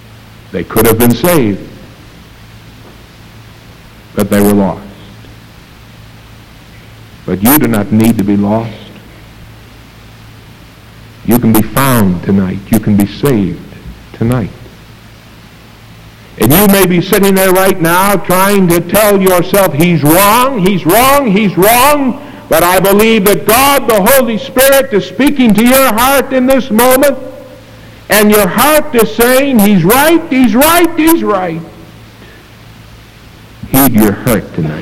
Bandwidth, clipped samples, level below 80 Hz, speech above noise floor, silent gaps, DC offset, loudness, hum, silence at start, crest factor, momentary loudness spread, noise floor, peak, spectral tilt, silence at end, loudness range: over 20 kHz; 0.7%; -34 dBFS; 27 dB; none; under 0.1%; -8 LUFS; none; 0 s; 10 dB; 10 LU; -35 dBFS; 0 dBFS; -5 dB/octave; 0 s; 9 LU